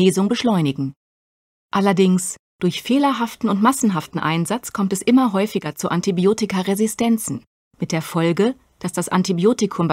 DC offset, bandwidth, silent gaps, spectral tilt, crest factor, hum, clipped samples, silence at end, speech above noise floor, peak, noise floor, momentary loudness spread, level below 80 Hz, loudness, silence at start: under 0.1%; 16 kHz; 0.96-1.69 s, 2.39-2.59 s, 7.47-7.71 s; -5.5 dB/octave; 16 dB; none; under 0.1%; 0 s; over 71 dB; -4 dBFS; under -90 dBFS; 8 LU; -60 dBFS; -20 LUFS; 0 s